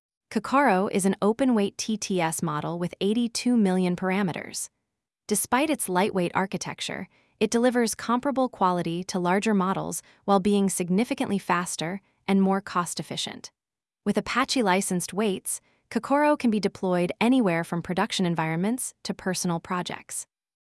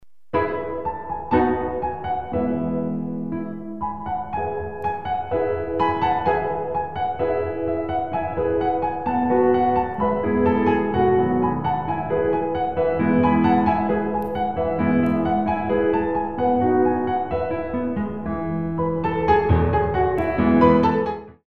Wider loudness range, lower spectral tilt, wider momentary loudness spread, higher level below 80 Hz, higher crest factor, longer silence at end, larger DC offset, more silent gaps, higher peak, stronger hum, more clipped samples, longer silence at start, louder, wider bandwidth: about the same, 3 LU vs 5 LU; second, -4.5 dB/octave vs -9.5 dB/octave; about the same, 10 LU vs 9 LU; second, -64 dBFS vs -40 dBFS; about the same, 18 dB vs 18 dB; first, 0.5 s vs 0 s; second, under 0.1% vs 0.9%; neither; second, -8 dBFS vs -2 dBFS; neither; neither; first, 0.3 s vs 0 s; second, -26 LUFS vs -22 LUFS; first, 12 kHz vs 5.4 kHz